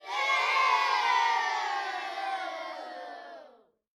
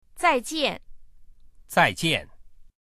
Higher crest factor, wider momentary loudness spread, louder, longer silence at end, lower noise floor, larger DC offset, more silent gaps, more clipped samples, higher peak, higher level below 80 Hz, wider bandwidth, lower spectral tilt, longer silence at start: second, 16 dB vs 22 dB; first, 18 LU vs 7 LU; second, -28 LUFS vs -24 LUFS; first, 0.5 s vs 0.3 s; first, -57 dBFS vs -47 dBFS; neither; neither; neither; second, -14 dBFS vs -4 dBFS; second, -90 dBFS vs -50 dBFS; second, 13.5 kHz vs 15 kHz; second, 2.5 dB/octave vs -3.5 dB/octave; about the same, 0.05 s vs 0.15 s